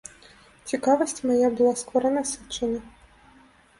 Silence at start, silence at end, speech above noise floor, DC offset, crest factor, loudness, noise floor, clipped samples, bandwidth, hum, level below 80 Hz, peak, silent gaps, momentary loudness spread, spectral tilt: 0.65 s; 0.9 s; 32 dB; under 0.1%; 18 dB; -24 LUFS; -55 dBFS; under 0.1%; 11.5 kHz; none; -58 dBFS; -8 dBFS; none; 12 LU; -3.5 dB/octave